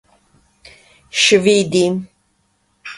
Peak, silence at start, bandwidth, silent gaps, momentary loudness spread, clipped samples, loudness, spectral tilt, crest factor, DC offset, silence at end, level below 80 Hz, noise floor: 0 dBFS; 1.15 s; 11.5 kHz; none; 14 LU; under 0.1%; -14 LUFS; -3.5 dB/octave; 18 dB; under 0.1%; 0 s; -58 dBFS; -63 dBFS